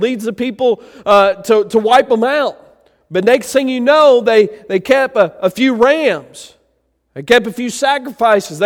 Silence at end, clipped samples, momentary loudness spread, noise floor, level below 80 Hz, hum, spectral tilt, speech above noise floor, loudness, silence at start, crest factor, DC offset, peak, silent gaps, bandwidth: 0 s; under 0.1%; 10 LU; -62 dBFS; -54 dBFS; none; -4 dB/octave; 50 dB; -13 LUFS; 0 s; 14 dB; under 0.1%; 0 dBFS; none; 17 kHz